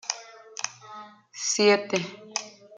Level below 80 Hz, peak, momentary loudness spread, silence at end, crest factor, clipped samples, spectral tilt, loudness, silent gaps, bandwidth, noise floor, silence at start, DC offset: -78 dBFS; -8 dBFS; 23 LU; 0.3 s; 22 dB; under 0.1%; -2.5 dB/octave; -26 LUFS; none; 9.6 kHz; -45 dBFS; 0.05 s; under 0.1%